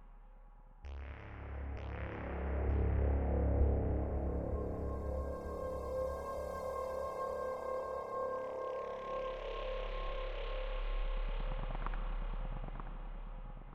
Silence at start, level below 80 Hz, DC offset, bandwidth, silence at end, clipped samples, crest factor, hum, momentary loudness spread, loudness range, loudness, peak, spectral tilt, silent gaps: 0 s; -40 dBFS; under 0.1%; 8.4 kHz; 0 s; under 0.1%; 18 dB; none; 14 LU; 6 LU; -40 LUFS; -20 dBFS; -8 dB/octave; none